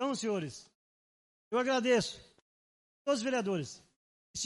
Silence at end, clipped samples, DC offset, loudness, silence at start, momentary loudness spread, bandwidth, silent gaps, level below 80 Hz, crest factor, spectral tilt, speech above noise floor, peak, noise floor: 0 s; under 0.1%; under 0.1%; -33 LUFS; 0 s; 18 LU; 11.5 kHz; 0.75-1.51 s, 2.42-3.05 s, 3.96-4.34 s; -72 dBFS; 18 dB; -4 dB/octave; over 58 dB; -18 dBFS; under -90 dBFS